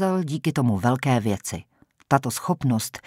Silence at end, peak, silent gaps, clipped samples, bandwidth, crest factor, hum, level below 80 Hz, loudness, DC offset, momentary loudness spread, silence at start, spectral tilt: 0.05 s; -4 dBFS; none; under 0.1%; 16 kHz; 20 dB; none; -56 dBFS; -24 LUFS; under 0.1%; 7 LU; 0 s; -6 dB/octave